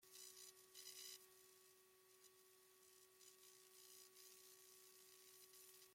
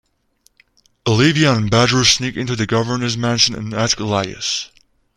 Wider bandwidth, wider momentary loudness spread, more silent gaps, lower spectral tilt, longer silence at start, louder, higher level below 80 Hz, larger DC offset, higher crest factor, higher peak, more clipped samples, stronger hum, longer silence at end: first, 16.5 kHz vs 12.5 kHz; about the same, 11 LU vs 9 LU; neither; second, 0.5 dB/octave vs -4 dB/octave; second, 0 s vs 1.05 s; second, -63 LUFS vs -16 LUFS; second, under -90 dBFS vs -46 dBFS; neither; first, 24 dB vs 18 dB; second, -42 dBFS vs 0 dBFS; neither; neither; second, 0 s vs 0.5 s